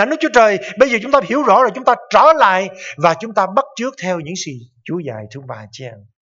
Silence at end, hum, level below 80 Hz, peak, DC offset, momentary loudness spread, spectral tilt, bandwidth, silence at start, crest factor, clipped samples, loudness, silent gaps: 0.3 s; none; -56 dBFS; 0 dBFS; under 0.1%; 20 LU; -4.5 dB/octave; 7.8 kHz; 0 s; 16 dB; under 0.1%; -14 LUFS; none